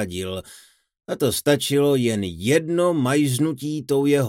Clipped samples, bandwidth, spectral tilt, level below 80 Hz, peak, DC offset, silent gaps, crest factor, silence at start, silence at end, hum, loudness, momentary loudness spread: under 0.1%; 17 kHz; -5 dB/octave; -56 dBFS; -4 dBFS; under 0.1%; none; 16 dB; 0 s; 0 s; none; -21 LUFS; 10 LU